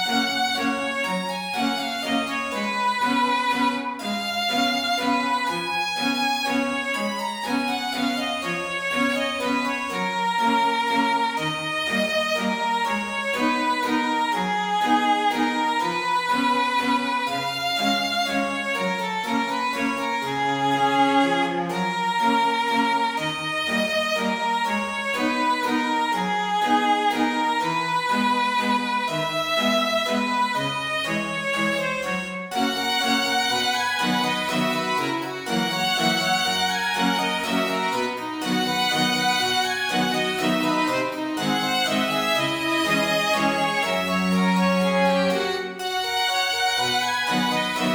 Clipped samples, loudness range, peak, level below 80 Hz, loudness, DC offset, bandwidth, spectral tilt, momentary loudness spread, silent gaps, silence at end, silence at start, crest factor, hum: under 0.1%; 2 LU; -8 dBFS; -62 dBFS; -22 LUFS; under 0.1%; over 20 kHz; -3.5 dB/octave; 5 LU; none; 0 s; 0 s; 16 dB; none